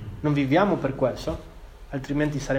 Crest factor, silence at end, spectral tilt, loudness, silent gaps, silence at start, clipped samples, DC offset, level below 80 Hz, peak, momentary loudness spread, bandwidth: 18 dB; 0 s; -7 dB/octave; -25 LUFS; none; 0 s; under 0.1%; under 0.1%; -42 dBFS; -8 dBFS; 14 LU; 16 kHz